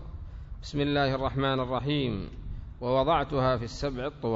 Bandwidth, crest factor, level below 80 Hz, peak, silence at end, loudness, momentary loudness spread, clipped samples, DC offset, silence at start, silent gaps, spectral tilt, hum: 7.8 kHz; 16 dB; -42 dBFS; -14 dBFS; 0 s; -29 LUFS; 17 LU; under 0.1%; under 0.1%; 0 s; none; -7 dB/octave; none